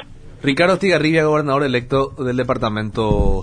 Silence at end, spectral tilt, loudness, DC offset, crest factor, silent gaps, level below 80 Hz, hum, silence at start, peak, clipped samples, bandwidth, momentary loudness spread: 0 s; -6.5 dB/octave; -18 LUFS; under 0.1%; 16 dB; none; -28 dBFS; none; 0 s; -2 dBFS; under 0.1%; 10 kHz; 6 LU